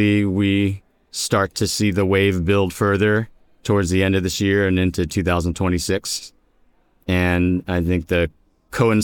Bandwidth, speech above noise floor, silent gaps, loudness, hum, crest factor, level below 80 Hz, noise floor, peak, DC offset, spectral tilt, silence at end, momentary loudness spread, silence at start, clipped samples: 18.5 kHz; 39 dB; none; -20 LUFS; none; 16 dB; -40 dBFS; -58 dBFS; -4 dBFS; under 0.1%; -5.5 dB/octave; 0 s; 9 LU; 0 s; under 0.1%